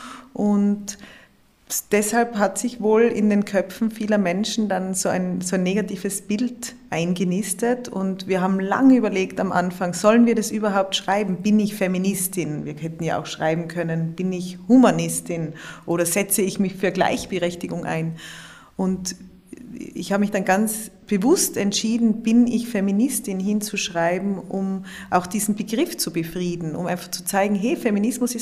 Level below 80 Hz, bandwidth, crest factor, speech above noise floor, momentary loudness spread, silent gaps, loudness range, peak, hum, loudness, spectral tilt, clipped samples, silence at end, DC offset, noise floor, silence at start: -56 dBFS; 15.5 kHz; 18 dB; 33 dB; 10 LU; none; 5 LU; -4 dBFS; none; -22 LUFS; -5 dB/octave; under 0.1%; 0 s; under 0.1%; -54 dBFS; 0 s